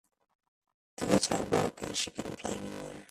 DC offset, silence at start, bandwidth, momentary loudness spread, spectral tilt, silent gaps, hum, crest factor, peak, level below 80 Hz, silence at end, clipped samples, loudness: under 0.1%; 1 s; 15 kHz; 13 LU; -4 dB/octave; none; none; 22 dB; -12 dBFS; -60 dBFS; 0.05 s; under 0.1%; -32 LUFS